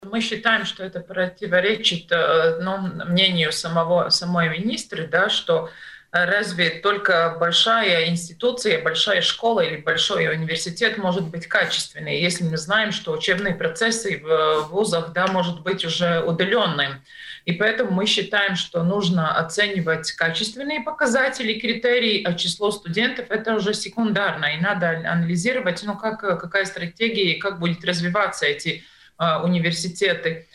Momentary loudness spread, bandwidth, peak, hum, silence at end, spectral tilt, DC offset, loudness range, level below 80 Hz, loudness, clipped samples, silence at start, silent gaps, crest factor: 7 LU; 12.5 kHz; -2 dBFS; none; 0.15 s; -4 dB/octave; under 0.1%; 3 LU; -60 dBFS; -21 LUFS; under 0.1%; 0 s; none; 20 dB